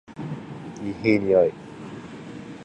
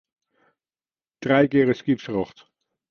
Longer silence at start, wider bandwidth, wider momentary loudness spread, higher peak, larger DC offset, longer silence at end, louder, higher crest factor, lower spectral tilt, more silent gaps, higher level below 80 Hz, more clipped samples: second, 0.1 s vs 1.2 s; first, 9.2 kHz vs 6.8 kHz; first, 19 LU vs 13 LU; about the same, -6 dBFS vs -4 dBFS; neither; second, 0 s vs 0.65 s; about the same, -23 LUFS vs -22 LUFS; about the same, 20 dB vs 20 dB; about the same, -7.5 dB/octave vs -7.5 dB/octave; neither; about the same, -56 dBFS vs -60 dBFS; neither